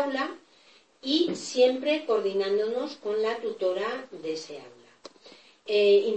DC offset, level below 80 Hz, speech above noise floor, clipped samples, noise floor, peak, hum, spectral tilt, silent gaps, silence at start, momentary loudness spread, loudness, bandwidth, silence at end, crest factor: under 0.1%; -82 dBFS; 33 dB; under 0.1%; -59 dBFS; -10 dBFS; none; -3.5 dB/octave; none; 0 s; 14 LU; -27 LUFS; 8.8 kHz; 0 s; 18 dB